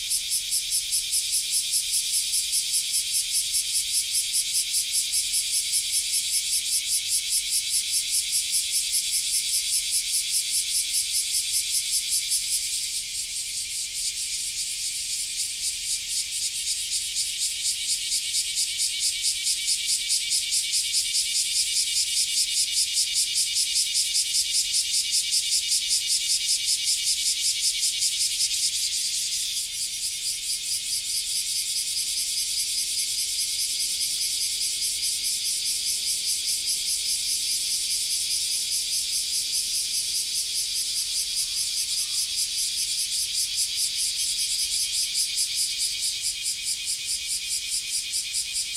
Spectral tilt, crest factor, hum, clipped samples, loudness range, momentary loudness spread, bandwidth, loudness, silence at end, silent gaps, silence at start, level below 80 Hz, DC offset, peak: 4 dB/octave; 18 dB; none; under 0.1%; 4 LU; 4 LU; 16.5 kHz; -23 LUFS; 0 s; none; 0 s; -58 dBFS; under 0.1%; -8 dBFS